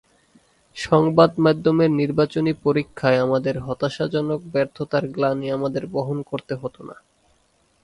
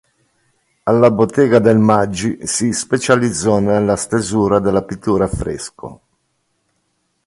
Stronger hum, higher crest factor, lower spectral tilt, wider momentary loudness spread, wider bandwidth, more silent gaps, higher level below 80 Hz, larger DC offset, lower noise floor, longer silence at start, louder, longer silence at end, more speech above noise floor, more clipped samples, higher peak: neither; about the same, 20 dB vs 16 dB; first, -7.5 dB/octave vs -5.5 dB/octave; about the same, 13 LU vs 12 LU; about the same, 11.5 kHz vs 11.5 kHz; neither; second, -54 dBFS vs -40 dBFS; neither; second, -63 dBFS vs -67 dBFS; about the same, 0.75 s vs 0.85 s; second, -21 LUFS vs -15 LUFS; second, 0.9 s vs 1.3 s; second, 42 dB vs 52 dB; neither; about the same, 0 dBFS vs 0 dBFS